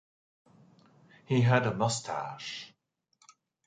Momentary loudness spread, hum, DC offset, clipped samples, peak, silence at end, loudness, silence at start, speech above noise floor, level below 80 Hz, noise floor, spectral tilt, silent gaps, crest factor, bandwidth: 16 LU; none; under 0.1%; under 0.1%; -10 dBFS; 1 s; -30 LUFS; 1.3 s; 46 dB; -68 dBFS; -74 dBFS; -5.5 dB/octave; none; 24 dB; 9.4 kHz